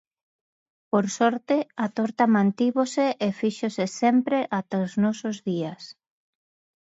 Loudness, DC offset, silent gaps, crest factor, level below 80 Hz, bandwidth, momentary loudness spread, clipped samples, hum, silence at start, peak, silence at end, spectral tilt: -24 LUFS; under 0.1%; none; 18 dB; -72 dBFS; 8 kHz; 8 LU; under 0.1%; none; 0.95 s; -6 dBFS; 0.95 s; -6 dB/octave